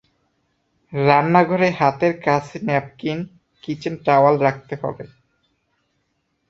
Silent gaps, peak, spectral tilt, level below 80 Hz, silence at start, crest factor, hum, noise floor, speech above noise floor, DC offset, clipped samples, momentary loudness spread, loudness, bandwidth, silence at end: none; 0 dBFS; -7.5 dB/octave; -60 dBFS; 0.9 s; 20 dB; none; -70 dBFS; 52 dB; under 0.1%; under 0.1%; 16 LU; -19 LUFS; 7.8 kHz; 1.45 s